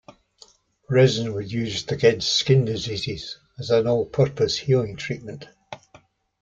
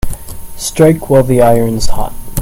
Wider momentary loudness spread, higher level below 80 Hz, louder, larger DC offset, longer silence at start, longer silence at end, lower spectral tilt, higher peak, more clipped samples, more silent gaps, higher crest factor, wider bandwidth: first, 20 LU vs 16 LU; second, -54 dBFS vs -22 dBFS; second, -22 LUFS vs -11 LUFS; neither; first, 0.9 s vs 0.05 s; first, 0.65 s vs 0 s; about the same, -5.5 dB/octave vs -6 dB/octave; second, -4 dBFS vs 0 dBFS; second, under 0.1% vs 0.5%; neither; first, 20 dB vs 10 dB; second, 7.8 kHz vs 17 kHz